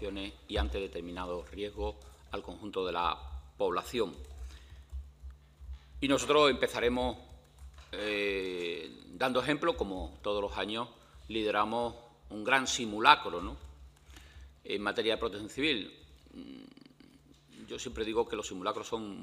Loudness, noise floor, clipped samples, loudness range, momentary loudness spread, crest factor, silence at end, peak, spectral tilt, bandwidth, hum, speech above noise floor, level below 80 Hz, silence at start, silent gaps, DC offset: -33 LUFS; -60 dBFS; under 0.1%; 7 LU; 22 LU; 30 dB; 0 s; -4 dBFS; -3.5 dB/octave; 15.5 kHz; none; 27 dB; -50 dBFS; 0 s; none; under 0.1%